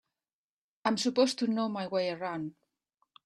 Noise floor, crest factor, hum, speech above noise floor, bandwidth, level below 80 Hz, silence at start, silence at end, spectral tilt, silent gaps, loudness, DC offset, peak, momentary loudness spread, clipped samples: under -90 dBFS; 20 dB; none; over 60 dB; 13 kHz; -78 dBFS; 0.85 s; 0.75 s; -4.5 dB/octave; none; -31 LUFS; under 0.1%; -12 dBFS; 10 LU; under 0.1%